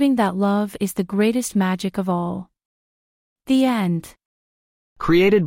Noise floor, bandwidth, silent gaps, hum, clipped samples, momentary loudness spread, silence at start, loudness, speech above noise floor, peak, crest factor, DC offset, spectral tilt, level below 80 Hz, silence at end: under -90 dBFS; 16.5 kHz; 2.65-3.36 s, 4.25-4.96 s; none; under 0.1%; 9 LU; 0 s; -21 LUFS; over 71 dB; -4 dBFS; 16 dB; under 0.1%; -6 dB/octave; -48 dBFS; 0 s